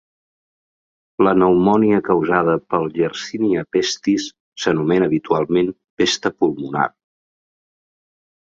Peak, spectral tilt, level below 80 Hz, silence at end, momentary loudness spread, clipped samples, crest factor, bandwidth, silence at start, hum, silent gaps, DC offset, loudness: -2 dBFS; -5.5 dB/octave; -54 dBFS; 1.55 s; 8 LU; under 0.1%; 18 dB; 7.8 kHz; 1.2 s; none; 4.40-4.52 s, 5.90-5.97 s; under 0.1%; -18 LUFS